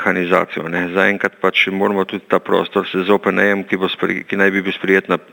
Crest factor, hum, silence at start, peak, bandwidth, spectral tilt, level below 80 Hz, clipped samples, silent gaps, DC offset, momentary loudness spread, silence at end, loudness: 16 dB; none; 0 s; 0 dBFS; 17.5 kHz; -6 dB/octave; -64 dBFS; under 0.1%; none; under 0.1%; 5 LU; 0.1 s; -16 LUFS